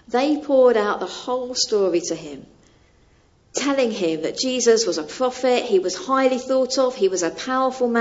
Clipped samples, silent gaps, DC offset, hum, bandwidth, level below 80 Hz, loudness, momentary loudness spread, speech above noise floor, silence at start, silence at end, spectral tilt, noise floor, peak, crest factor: under 0.1%; none; under 0.1%; none; 8 kHz; -60 dBFS; -20 LUFS; 9 LU; 36 dB; 0.1 s; 0 s; -3 dB/octave; -56 dBFS; -4 dBFS; 16 dB